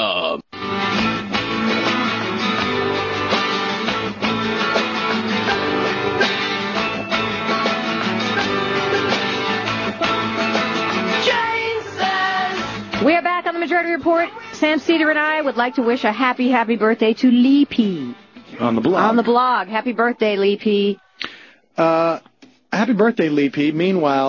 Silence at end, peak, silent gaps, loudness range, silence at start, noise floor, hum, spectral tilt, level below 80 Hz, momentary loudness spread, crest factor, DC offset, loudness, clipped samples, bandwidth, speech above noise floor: 0 s; -4 dBFS; none; 3 LU; 0 s; -42 dBFS; none; -5 dB/octave; -54 dBFS; 6 LU; 16 dB; under 0.1%; -18 LUFS; under 0.1%; 7.2 kHz; 26 dB